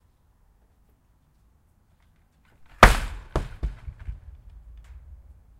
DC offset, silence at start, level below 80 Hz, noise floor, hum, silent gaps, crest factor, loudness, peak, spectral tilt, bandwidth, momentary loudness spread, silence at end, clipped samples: under 0.1%; 2.8 s; -32 dBFS; -62 dBFS; none; none; 28 dB; -22 LUFS; 0 dBFS; -4.5 dB/octave; 16 kHz; 25 LU; 1.45 s; under 0.1%